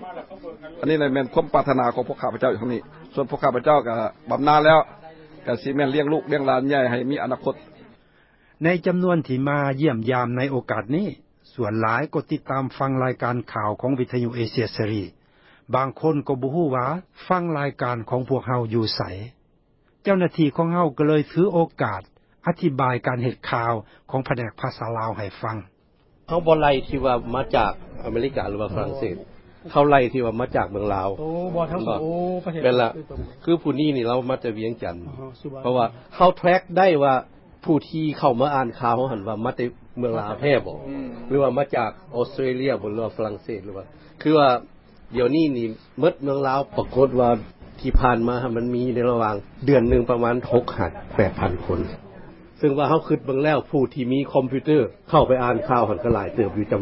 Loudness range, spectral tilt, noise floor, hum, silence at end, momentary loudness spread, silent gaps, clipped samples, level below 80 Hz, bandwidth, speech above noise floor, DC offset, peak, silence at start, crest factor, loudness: 4 LU; -11.5 dB/octave; -61 dBFS; none; 0 s; 11 LU; none; under 0.1%; -42 dBFS; 5.8 kHz; 39 dB; under 0.1%; -2 dBFS; 0 s; 20 dB; -22 LUFS